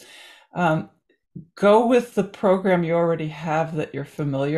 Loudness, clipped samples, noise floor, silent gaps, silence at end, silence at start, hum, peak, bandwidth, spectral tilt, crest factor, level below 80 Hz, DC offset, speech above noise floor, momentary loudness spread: -21 LUFS; under 0.1%; -47 dBFS; none; 0 s; 0.55 s; none; -6 dBFS; 13 kHz; -7.5 dB/octave; 16 dB; -62 dBFS; under 0.1%; 26 dB; 12 LU